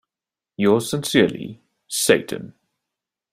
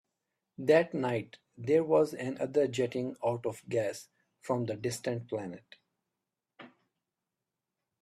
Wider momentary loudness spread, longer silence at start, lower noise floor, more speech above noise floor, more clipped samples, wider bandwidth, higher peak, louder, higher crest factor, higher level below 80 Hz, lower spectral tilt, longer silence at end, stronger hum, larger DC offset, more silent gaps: about the same, 15 LU vs 15 LU; about the same, 0.6 s vs 0.6 s; about the same, -89 dBFS vs -89 dBFS; first, 70 dB vs 58 dB; neither; first, 16 kHz vs 13.5 kHz; first, -2 dBFS vs -12 dBFS; first, -20 LUFS vs -32 LUFS; about the same, 22 dB vs 22 dB; first, -58 dBFS vs -74 dBFS; second, -4 dB/octave vs -6 dB/octave; second, 0.85 s vs 1.35 s; neither; neither; neither